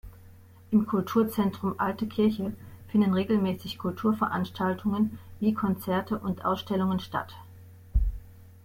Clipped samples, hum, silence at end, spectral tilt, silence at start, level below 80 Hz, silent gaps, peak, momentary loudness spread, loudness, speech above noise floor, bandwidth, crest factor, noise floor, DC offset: under 0.1%; none; 0.15 s; -7.5 dB/octave; 0.05 s; -40 dBFS; none; -12 dBFS; 9 LU; -28 LUFS; 24 dB; 16.5 kHz; 16 dB; -51 dBFS; under 0.1%